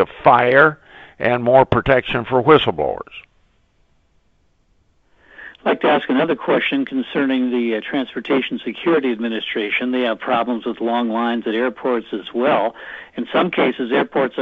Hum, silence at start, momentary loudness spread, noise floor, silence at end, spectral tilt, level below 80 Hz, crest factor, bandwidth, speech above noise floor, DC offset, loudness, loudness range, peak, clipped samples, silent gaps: none; 0 s; 10 LU; -60 dBFS; 0 s; -8 dB/octave; -48 dBFS; 18 dB; 5.2 kHz; 42 dB; under 0.1%; -18 LUFS; 5 LU; 0 dBFS; under 0.1%; none